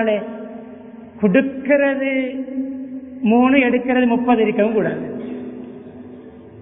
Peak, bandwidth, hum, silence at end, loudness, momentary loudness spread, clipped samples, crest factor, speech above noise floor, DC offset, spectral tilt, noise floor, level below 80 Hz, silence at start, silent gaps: 0 dBFS; 3.7 kHz; none; 0 s; -18 LUFS; 22 LU; under 0.1%; 18 dB; 22 dB; under 0.1%; -11.5 dB/octave; -38 dBFS; -56 dBFS; 0 s; none